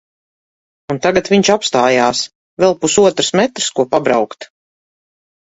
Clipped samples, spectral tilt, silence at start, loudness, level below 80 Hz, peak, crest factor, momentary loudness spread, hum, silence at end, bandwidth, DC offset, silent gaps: under 0.1%; -3.5 dB/octave; 0.9 s; -14 LUFS; -52 dBFS; 0 dBFS; 16 dB; 10 LU; none; 1.1 s; 8 kHz; under 0.1%; 2.35-2.57 s